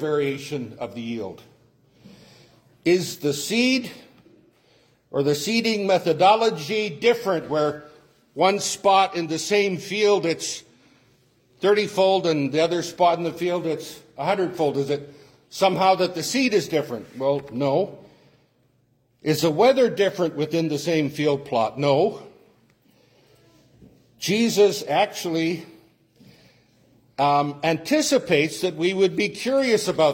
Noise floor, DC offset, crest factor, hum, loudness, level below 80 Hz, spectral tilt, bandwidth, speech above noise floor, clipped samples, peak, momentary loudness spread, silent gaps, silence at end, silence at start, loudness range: -64 dBFS; under 0.1%; 18 dB; none; -22 LUFS; -66 dBFS; -4.5 dB/octave; 16.5 kHz; 43 dB; under 0.1%; -4 dBFS; 12 LU; none; 0 s; 0 s; 4 LU